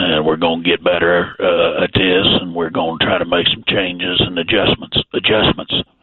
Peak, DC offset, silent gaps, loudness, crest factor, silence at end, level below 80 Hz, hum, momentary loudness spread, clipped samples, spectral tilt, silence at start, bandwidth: 0 dBFS; under 0.1%; none; -15 LUFS; 14 dB; 0.2 s; -40 dBFS; none; 5 LU; under 0.1%; -8.5 dB/octave; 0 s; 4.4 kHz